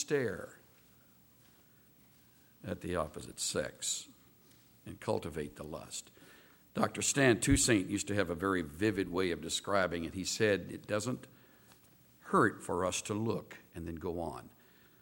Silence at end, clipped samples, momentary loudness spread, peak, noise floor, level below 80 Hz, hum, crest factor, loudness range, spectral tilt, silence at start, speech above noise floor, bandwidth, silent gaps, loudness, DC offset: 0.55 s; under 0.1%; 16 LU; -12 dBFS; -64 dBFS; -56 dBFS; none; 24 dB; 10 LU; -4 dB/octave; 0 s; 30 dB; 18.5 kHz; none; -34 LUFS; under 0.1%